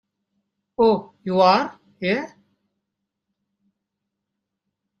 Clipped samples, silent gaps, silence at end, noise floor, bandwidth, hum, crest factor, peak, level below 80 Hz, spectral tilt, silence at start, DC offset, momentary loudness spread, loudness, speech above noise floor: under 0.1%; none; 2.75 s; -81 dBFS; 9.4 kHz; none; 22 dB; -2 dBFS; -64 dBFS; -6.5 dB/octave; 0.8 s; under 0.1%; 16 LU; -20 LUFS; 62 dB